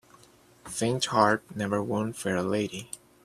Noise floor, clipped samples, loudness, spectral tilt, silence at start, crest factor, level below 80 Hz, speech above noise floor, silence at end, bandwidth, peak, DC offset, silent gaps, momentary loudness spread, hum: -57 dBFS; under 0.1%; -28 LUFS; -4.5 dB/octave; 0.65 s; 24 dB; -64 dBFS; 30 dB; 0.3 s; 15 kHz; -6 dBFS; under 0.1%; none; 13 LU; none